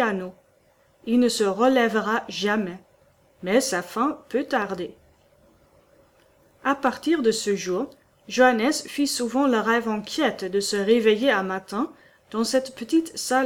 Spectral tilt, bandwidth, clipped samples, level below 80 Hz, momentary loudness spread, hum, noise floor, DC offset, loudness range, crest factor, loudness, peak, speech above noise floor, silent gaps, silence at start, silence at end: -3.5 dB/octave; 18.5 kHz; under 0.1%; -64 dBFS; 11 LU; none; -61 dBFS; under 0.1%; 5 LU; 20 dB; -23 LUFS; -4 dBFS; 38 dB; none; 0 s; 0 s